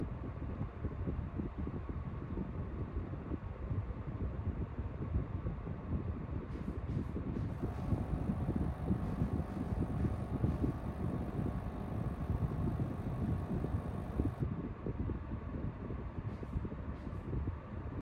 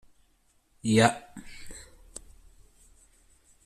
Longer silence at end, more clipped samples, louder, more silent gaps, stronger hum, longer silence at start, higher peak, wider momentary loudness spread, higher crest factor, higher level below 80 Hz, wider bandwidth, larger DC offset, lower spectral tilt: second, 0 s vs 1.85 s; neither; second, -40 LUFS vs -25 LUFS; neither; neither; second, 0 s vs 0.85 s; second, -18 dBFS vs -6 dBFS; second, 6 LU vs 24 LU; second, 20 dB vs 26 dB; first, -44 dBFS vs -56 dBFS; second, 10 kHz vs 13.5 kHz; neither; first, -10 dB/octave vs -5 dB/octave